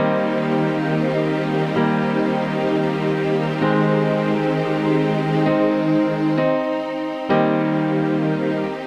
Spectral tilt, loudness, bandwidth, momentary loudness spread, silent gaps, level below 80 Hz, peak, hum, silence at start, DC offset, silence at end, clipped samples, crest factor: -8 dB/octave; -20 LUFS; 9 kHz; 3 LU; none; -64 dBFS; -6 dBFS; none; 0 s; 0.1%; 0 s; under 0.1%; 14 dB